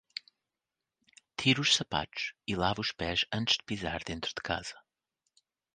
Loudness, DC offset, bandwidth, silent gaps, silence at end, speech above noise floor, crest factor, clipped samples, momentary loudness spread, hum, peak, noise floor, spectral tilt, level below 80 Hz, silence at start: -31 LUFS; under 0.1%; 10 kHz; none; 0.95 s; 58 dB; 24 dB; under 0.1%; 12 LU; none; -10 dBFS; -90 dBFS; -3 dB/octave; -56 dBFS; 1.4 s